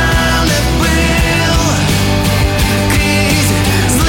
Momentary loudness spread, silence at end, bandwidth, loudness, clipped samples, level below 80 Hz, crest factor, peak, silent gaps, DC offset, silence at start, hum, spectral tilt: 1 LU; 0 s; 17 kHz; -11 LUFS; under 0.1%; -20 dBFS; 10 dB; -2 dBFS; none; under 0.1%; 0 s; none; -4.5 dB/octave